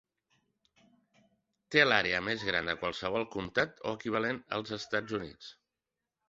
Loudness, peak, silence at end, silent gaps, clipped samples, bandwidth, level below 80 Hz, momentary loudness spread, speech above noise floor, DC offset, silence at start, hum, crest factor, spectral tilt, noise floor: -31 LUFS; -8 dBFS; 0.75 s; none; under 0.1%; 7.8 kHz; -64 dBFS; 13 LU; 57 dB; under 0.1%; 1.7 s; none; 26 dB; -1.5 dB/octave; -89 dBFS